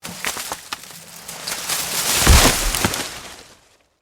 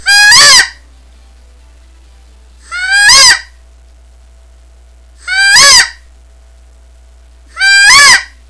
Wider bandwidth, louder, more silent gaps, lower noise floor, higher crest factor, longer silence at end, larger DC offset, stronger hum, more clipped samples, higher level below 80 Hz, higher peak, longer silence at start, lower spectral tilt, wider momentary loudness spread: first, over 20 kHz vs 11 kHz; second, -18 LUFS vs -3 LUFS; neither; first, -54 dBFS vs -38 dBFS; first, 20 dB vs 10 dB; first, 0.6 s vs 0.25 s; neither; neither; second, under 0.1% vs 3%; first, -26 dBFS vs -36 dBFS; about the same, 0 dBFS vs 0 dBFS; about the same, 0.05 s vs 0.05 s; first, -2.5 dB/octave vs 2.5 dB/octave; first, 22 LU vs 14 LU